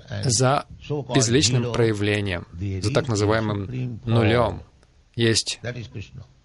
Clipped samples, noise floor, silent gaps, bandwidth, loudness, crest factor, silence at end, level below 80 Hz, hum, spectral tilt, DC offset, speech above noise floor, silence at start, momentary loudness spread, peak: under 0.1%; -46 dBFS; none; 11.5 kHz; -22 LUFS; 18 dB; 0.2 s; -48 dBFS; none; -4.5 dB/octave; under 0.1%; 24 dB; 0.05 s; 14 LU; -6 dBFS